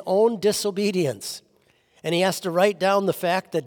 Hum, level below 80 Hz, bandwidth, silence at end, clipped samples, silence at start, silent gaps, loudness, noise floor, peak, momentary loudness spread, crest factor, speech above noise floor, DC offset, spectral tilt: none; -70 dBFS; over 20 kHz; 0 s; under 0.1%; 0 s; none; -22 LUFS; -62 dBFS; -6 dBFS; 13 LU; 16 dB; 40 dB; under 0.1%; -4.5 dB/octave